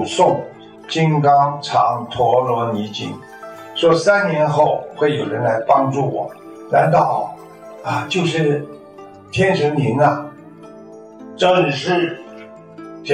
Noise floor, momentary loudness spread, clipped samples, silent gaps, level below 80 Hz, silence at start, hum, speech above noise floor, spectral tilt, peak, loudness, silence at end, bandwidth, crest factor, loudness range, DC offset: -39 dBFS; 22 LU; under 0.1%; none; -58 dBFS; 0 s; none; 23 dB; -6 dB/octave; -2 dBFS; -17 LUFS; 0 s; 10.5 kHz; 16 dB; 3 LU; under 0.1%